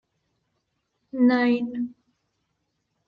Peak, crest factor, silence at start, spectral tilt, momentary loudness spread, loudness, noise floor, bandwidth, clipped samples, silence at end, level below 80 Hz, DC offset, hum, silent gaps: -10 dBFS; 18 dB; 1.15 s; -7 dB/octave; 15 LU; -23 LUFS; -76 dBFS; 5.2 kHz; under 0.1%; 1.15 s; -72 dBFS; under 0.1%; none; none